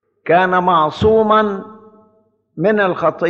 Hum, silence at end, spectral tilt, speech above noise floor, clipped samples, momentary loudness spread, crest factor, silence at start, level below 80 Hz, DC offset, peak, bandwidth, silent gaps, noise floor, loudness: none; 0 s; -7.5 dB/octave; 44 dB; under 0.1%; 7 LU; 14 dB; 0.25 s; -44 dBFS; under 0.1%; -2 dBFS; 7.4 kHz; none; -57 dBFS; -14 LUFS